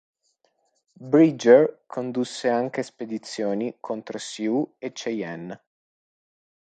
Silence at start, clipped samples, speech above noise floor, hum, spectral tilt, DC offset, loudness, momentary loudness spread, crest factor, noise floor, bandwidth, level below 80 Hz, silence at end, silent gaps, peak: 1 s; under 0.1%; 47 dB; none; -5.5 dB/octave; under 0.1%; -24 LUFS; 17 LU; 22 dB; -70 dBFS; 9.2 kHz; -76 dBFS; 1.25 s; none; -2 dBFS